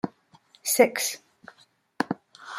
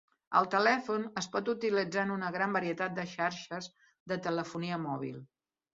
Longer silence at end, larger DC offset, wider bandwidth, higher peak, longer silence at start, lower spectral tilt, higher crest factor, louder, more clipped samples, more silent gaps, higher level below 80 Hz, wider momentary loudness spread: second, 0 s vs 0.5 s; neither; first, 16 kHz vs 7.6 kHz; first, -6 dBFS vs -12 dBFS; second, 0.05 s vs 0.3 s; about the same, -2.5 dB/octave vs -3.5 dB/octave; about the same, 24 dB vs 22 dB; first, -26 LUFS vs -33 LUFS; neither; second, none vs 4.00-4.06 s; about the same, -76 dBFS vs -76 dBFS; about the same, 15 LU vs 13 LU